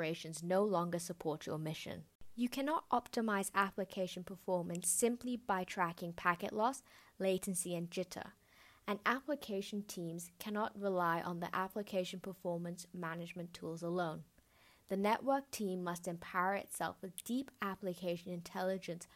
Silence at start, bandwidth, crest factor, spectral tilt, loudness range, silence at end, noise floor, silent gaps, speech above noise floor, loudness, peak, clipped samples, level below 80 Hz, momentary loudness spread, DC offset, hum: 0 s; 16 kHz; 22 dB; -4.5 dB/octave; 4 LU; 0.1 s; -68 dBFS; 2.15-2.19 s; 29 dB; -39 LUFS; -16 dBFS; under 0.1%; -74 dBFS; 10 LU; under 0.1%; none